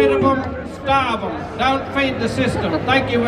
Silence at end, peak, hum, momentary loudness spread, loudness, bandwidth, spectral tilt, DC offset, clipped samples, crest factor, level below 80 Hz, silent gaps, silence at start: 0 s; -2 dBFS; none; 7 LU; -19 LUFS; 13 kHz; -6 dB/octave; under 0.1%; under 0.1%; 16 dB; -40 dBFS; none; 0 s